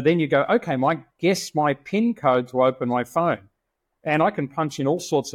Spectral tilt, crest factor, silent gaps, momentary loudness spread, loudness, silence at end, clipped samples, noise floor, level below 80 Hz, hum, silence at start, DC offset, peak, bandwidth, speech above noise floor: -6 dB/octave; 16 dB; none; 5 LU; -22 LUFS; 0 s; under 0.1%; -78 dBFS; -64 dBFS; none; 0 s; under 0.1%; -6 dBFS; 16 kHz; 56 dB